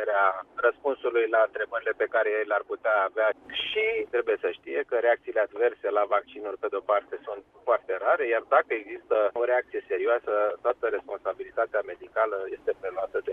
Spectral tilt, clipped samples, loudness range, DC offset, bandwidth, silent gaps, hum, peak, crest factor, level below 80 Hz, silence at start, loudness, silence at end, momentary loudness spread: -5 dB/octave; under 0.1%; 2 LU; under 0.1%; 4 kHz; none; none; -8 dBFS; 20 dB; -70 dBFS; 0 s; -27 LUFS; 0 s; 8 LU